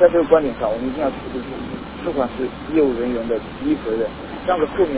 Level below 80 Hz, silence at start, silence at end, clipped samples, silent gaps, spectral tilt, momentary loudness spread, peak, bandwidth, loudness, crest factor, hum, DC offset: -42 dBFS; 0 s; 0 s; under 0.1%; none; -10.5 dB/octave; 12 LU; 0 dBFS; 4 kHz; -21 LUFS; 20 dB; none; under 0.1%